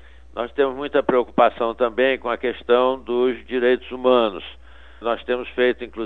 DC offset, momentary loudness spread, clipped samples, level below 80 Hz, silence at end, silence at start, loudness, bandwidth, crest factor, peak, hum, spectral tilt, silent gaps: 0.5%; 9 LU; under 0.1%; -48 dBFS; 0 s; 0.35 s; -21 LUFS; 4.3 kHz; 20 dB; -2 dBFS; none; -7 dB/octave; none